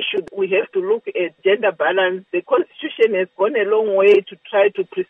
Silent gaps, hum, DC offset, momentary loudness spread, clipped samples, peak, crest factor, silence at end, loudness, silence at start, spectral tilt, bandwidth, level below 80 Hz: none; none; under 0.1%; 8 LU; under 0.1%; -4 dBFS; 14 dB; 0.05 s; -18 LUFS; 0 s; -6.5 dB/octave; 3.9 kHz; -72 dBFS